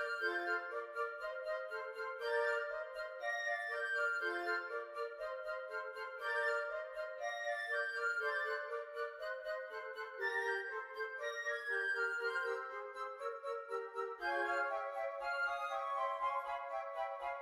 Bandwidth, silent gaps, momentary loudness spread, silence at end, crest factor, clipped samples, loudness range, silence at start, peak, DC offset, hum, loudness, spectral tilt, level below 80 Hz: 15 kHz; none; 8 LU; 0 s; 14 dB; under 0.1%; 2 LU; 0 s; -26 dBFS; under 0.1%; none; -40 LUFS; -1 dB/octave; -80 dBFS